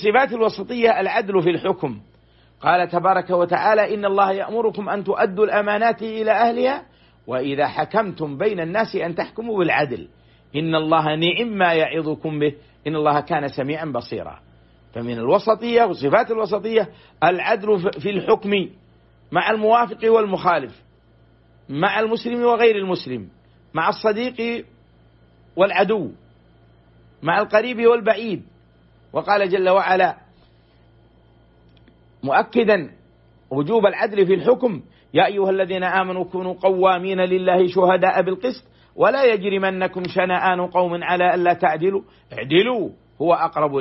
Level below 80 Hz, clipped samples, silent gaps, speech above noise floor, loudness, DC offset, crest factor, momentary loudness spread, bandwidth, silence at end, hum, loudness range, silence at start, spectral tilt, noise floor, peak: -58 dBFS; under 0.1%; none; 35 dB; -20 LUFS; under 0.1%; 16 dB; 11 LU; 6 kHz; 0 s; none; 4 LU; 0 s; -9 dB/octave; -54 dBFS; -4 dBFS